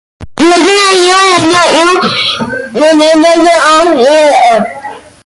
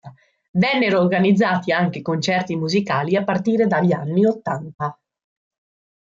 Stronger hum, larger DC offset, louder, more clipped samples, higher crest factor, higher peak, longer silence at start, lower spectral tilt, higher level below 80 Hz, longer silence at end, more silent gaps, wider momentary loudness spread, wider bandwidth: neither; neither; first, -6 LUFS vs -19 LUFS; neither; second, 8 dB vs 14 dB; first, 0 dBFS vs -6 dBFS; first, 0.2 s vs 0.05 s; second, -2.5 dB/octave vs -6.5 dB/octave; first, -44 dBFS vs -62 dBFS; second, 0.25 s vs 1.1 s; second, none vs 0.48-0.54 s, 4.75-4.79 s; about the same, 10 LU vs 9 LU; first, 11.5 kHz vs 7.6 kHz